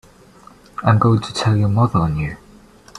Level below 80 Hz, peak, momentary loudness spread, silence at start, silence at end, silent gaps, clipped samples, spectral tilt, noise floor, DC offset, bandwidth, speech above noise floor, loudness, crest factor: -42 dBFS; -2 dBFS; 13 LU; 0.8 s; 0.6 s; none; under 0.1%; -7 dB/octave; -46 dBFS; under 0.1%; 10.5 kHz; 30 dB; -17 LUFS; 18 dB